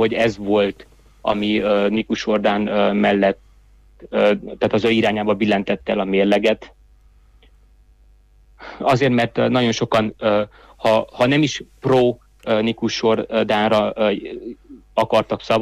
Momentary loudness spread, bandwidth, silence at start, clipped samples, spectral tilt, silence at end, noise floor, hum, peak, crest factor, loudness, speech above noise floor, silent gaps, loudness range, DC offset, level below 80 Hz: 8 LU; 12.5 kHz; 0 s; under 0.1%; -5.5 dB/octave; 0 s; -51 dBFS; none; -6 dBFS; 14 dB; -19 LUFS; 33 dB; none; 4 LU; under 0.1%; -50 dBFS